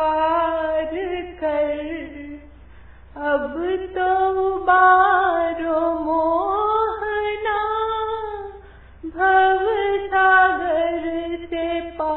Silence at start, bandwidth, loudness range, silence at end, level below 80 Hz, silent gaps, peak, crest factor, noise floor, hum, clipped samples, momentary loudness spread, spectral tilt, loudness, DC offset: 0 s; 4.2 kHz; 7 LU; 0 s; -46 dBFS; none; -4 dBFS; 16 dB; -45 dBFS; none; under 0.1%; 13 LU; -8.5 dB/octave; -20 LUFS; under 0.1%